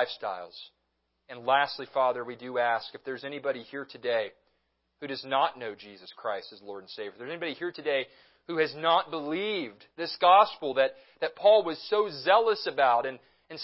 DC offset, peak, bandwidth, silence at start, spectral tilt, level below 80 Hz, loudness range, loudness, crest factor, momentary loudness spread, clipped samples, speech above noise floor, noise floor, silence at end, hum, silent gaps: under 0.1%; -8 dBFS; 5.8 kHz; 0 s; -7.5 dB/octave; -82 dBFS; 9 LU; -28 LUFS; 22 dB; 18 LU; under 0.1%; 49 dB; -78 dBFS; 0 s; none; none